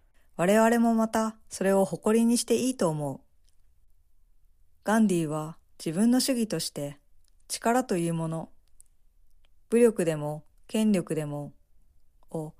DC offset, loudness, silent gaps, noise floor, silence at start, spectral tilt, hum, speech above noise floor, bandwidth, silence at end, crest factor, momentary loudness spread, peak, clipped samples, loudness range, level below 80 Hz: under 0.1%; -27 LUFS; none; -58 dBFS; 0.4 s; -5 dB/octave; none; 32 dB; 15.5 kHz; 0.1 s; 18 dB; 15 LU; -10 dBFS; under 0.1%; 5 LU; -60 dBFS